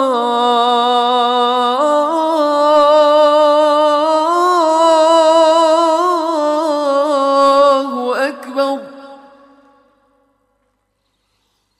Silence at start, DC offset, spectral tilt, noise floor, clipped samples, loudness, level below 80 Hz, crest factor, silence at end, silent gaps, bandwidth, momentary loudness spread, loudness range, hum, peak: 0 s; under 0.1%; -2 dB/octave; -66 dBFS; under 0.1%; -12 LUFS; -64 dBFS; 10 dB; 2.65 s; none; 14.5 kHz; 8 LU; 11 LU; none; -2 dBFS